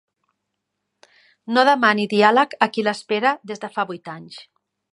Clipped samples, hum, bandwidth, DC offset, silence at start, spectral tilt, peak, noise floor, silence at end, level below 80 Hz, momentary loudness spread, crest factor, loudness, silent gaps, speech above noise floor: under 0.1%; none; 11.5 kHz; under 0.1%; 1.5 s; -4.5 dB/octave; 0 dBFS; -78 dBFS; 0.5 s; -76 dBFS; 18 LU; 20 dB; -19 LUFS; none; 59 dB